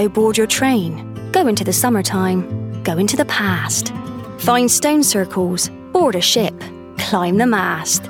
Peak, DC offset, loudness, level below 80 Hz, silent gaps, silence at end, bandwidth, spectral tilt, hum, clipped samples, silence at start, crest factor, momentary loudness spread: 0 dBFS; under 0.1%; -16 LUFS; -52 dBFS; none; 0 s; 18.5 kHz; -3.5 dB/octave; none; under 0.1%; 0 s; 16 dB; 11 LU